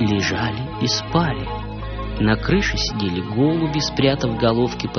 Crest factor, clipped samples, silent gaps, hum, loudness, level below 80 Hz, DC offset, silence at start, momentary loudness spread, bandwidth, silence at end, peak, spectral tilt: 16 dB; under 0.1%; none; none; -20 LUFS; -34 dBFS; under 0.1%; 0 s; 9 LU; 6.6 kHz; 0 s; -4 dBFS; -4.5 dB/octave